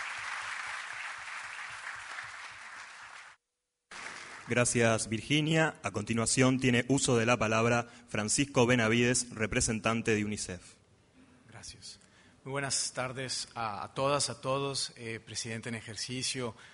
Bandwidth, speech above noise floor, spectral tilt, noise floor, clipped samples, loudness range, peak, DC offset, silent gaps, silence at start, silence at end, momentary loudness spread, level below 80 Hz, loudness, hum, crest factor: 11 kHz; 55 dB; -4 dB/octave; -86 dBFS; under 0.1%; 12 LU; -12 dBFS; under 0.1%; none; 0 s; 0.05 s; 19 LU; -58 dBFS; -31 LUFS; none; 22 dB